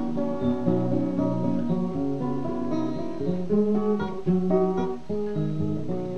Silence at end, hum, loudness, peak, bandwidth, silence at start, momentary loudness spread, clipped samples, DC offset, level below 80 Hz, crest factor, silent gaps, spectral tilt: 0 s; none; -26 LUFS; -8 dBFS; 8.2 kHz; 0 s; 6 LU; under 0.1%; 2%; -52 dBFS; 16 dB; none; -9.5 dB/octave